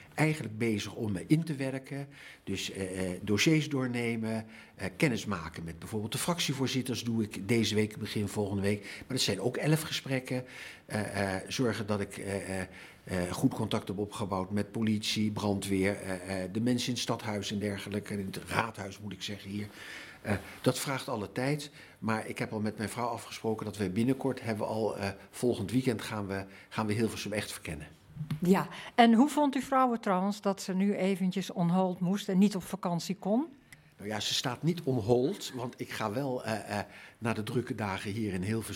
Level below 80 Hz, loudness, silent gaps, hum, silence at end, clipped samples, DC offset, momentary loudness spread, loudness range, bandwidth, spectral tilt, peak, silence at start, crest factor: -66 dBFS; -32 LUFS; none; none; 0 s; under 0.1%; under 0.1%; 11 LU; 6 LU; 16.5 kHz; -5 dB/octave; -8 dBFS; 0 s; 24 dB